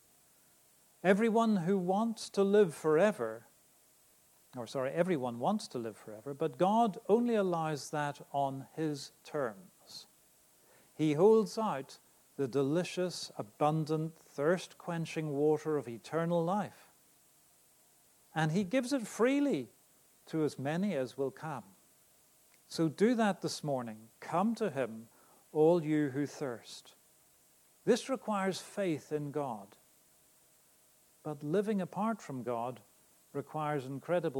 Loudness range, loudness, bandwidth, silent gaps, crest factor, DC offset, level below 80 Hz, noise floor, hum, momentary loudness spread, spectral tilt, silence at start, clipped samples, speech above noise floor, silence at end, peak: 6 LU; -33 LUFS; 19 kHz; none; 20 dB; under 0.1%; -82 dBFS; -66 dBFS; none; 15 LU; -6 dB/octave; 1.05 s; under 0.1%; 34 dB; 0 s; -14 dBFS